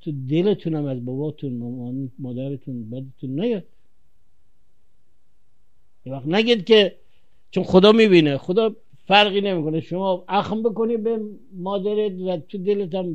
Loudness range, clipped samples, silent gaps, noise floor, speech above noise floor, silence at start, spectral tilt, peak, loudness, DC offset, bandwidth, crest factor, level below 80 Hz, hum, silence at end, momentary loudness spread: 14 LU; under 0.1%; none; -68 dBFS; 48 dB; 0.05 s; -7 dB/octave; 0 dBFS; -21 LUFS; 0.7%; 8.6 kHz; 20 dB; -58 dBFS; none; 0 s; 16 LU